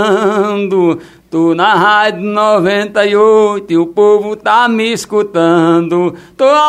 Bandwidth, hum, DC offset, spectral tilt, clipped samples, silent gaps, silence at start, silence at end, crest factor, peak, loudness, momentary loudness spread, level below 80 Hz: 13.5 kHz; none; under 0.1%; -5.5 dB/octave; under 0.1%; none; 0 s; 0 s; 10 dB; 0 dBFS; -11 LUFS; 6 LU; -56 dBFS